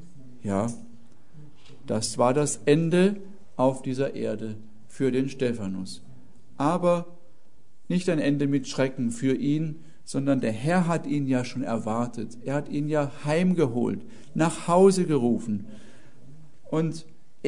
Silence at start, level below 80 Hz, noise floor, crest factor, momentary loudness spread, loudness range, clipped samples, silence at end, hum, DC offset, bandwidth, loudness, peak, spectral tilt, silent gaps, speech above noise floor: 0 s; -62 dBFS; -62 dBFS; 20 dB; 13 LU; 4 LU; under 0.1%; 0 s; none; 1%; 11 kHz; -26 LUFS; -6 dBFS; -6.5 dB/octave; none; 37 dB